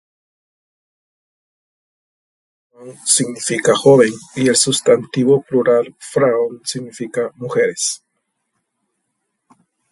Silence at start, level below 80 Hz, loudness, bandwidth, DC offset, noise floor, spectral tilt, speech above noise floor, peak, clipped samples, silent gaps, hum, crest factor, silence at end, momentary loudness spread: 2.8 s; -64 dBFS; -16 LUFS; 11.5 kHz; under 0.1%; -73 dBFS; -3.5 dB/octave; 57 dB; 0 dBFS; under 0.1%; none; none; 18 dB; 1.95 s; 12 LU